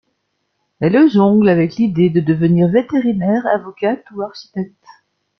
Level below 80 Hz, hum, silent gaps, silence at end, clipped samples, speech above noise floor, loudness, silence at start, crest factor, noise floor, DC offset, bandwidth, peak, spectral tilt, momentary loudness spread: -54 dBFS; none; none; 0.75 s; under 0.1%; 55 dB; -15 LUFS; 0.8 s; 14 dB; -69 dBFS; under 0.1%; 6.2 kHz; -2 dBFS; -9.5 dB/octave; 15 LU